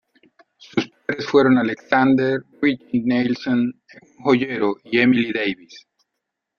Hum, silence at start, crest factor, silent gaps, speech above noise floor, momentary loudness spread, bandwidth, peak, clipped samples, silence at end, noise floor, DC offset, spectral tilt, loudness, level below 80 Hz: none; 0.75 s; 18 dB; none; 61 dB; 10 LU; 6.8 kHz; -2 dBFS; under 0.1%; 0.8 s; -80 dBFS; under 0.1%; -6.5 dB/octave; -20 LUFS; -62 dBFS